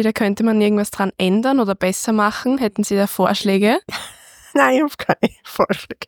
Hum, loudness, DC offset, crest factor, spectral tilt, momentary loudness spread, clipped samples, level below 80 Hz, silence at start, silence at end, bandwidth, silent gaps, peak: none; -18 LUFS; under 0.1%; 16 dB; -5 dB/octave; 6 LU; under 0.1%; -54 dBFS; 0 s; 0 s; 19.5 kHz; none; 0 dBFS